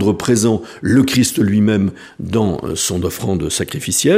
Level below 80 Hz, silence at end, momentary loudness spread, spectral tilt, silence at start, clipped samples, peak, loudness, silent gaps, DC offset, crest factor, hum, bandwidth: -42 dBFS; 0 s; 6 LU; -4.5 dB/octave; 0 s; under 0.1%; -2 dBFS; -16 LUFS; none; under 0.1%; 14 dB; none; 15.5 kHz